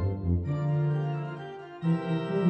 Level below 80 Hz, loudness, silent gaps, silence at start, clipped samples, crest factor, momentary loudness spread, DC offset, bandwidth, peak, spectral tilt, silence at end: -46 dBFS; -30 LUFS; none; 0 s; under 0.1%; 14 dB; 10 LU; under 0.1%; 5.6 kHz; -14 dBFS; -10 dB/octave; 0 s